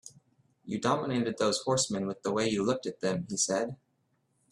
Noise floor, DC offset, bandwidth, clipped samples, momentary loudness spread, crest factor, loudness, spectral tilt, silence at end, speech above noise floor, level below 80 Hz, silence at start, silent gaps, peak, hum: -74 dBFS; under 0.1%; 12.5 kHz; under 0.1%; 5 LU; 20 dB; -30 LUFS; -4 dB/octave; 0.75 s; 44 dB; -68 dBFS; 0.05 s; none; -12 dBFS; none